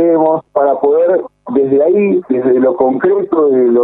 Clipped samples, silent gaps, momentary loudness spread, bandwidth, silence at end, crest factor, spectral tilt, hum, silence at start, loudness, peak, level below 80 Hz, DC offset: under 0.1%; none; 3 LU; 3.9 kHz; 0 s; 10 dB; -11.5 dB/octave; none; 0 s; -12 LUFS; 0 dBFS; -56 dBFS; under 0.1%